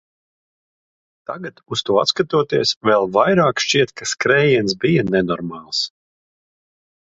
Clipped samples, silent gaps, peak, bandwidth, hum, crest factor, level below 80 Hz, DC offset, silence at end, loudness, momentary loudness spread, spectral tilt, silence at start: under 0.1%; 2.76-2.81 s; 0 dBFS; 8 kHz; none; 20 dB; -54 dBFS; under 0.1%; 1.15 s; -17 LUFS; 12 LU; -4.5 dB/octave; 1.3 s